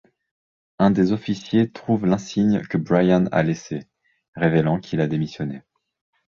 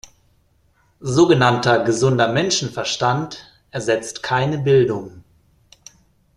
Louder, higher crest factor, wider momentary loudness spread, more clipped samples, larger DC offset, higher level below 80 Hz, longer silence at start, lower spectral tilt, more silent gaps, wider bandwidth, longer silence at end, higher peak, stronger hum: second, -21 LUFS vs -18 LUFS; about the same, 18 dB vs 18 dB; second, 12 LU vs 16 LU; neither; neither; about the same, -54 dBFS vs -52 dBFS; second, 0.8 s vs 1 s; first, -7.5 dB/octave vs -5 dB/octave; first, 4.28-4.33 s vs none; second, 7.2 kHz vs 11.5 kHz; second, 0.7 s vs 1.15 s; about the same, -4 dBFS vs -2 dBFS; neither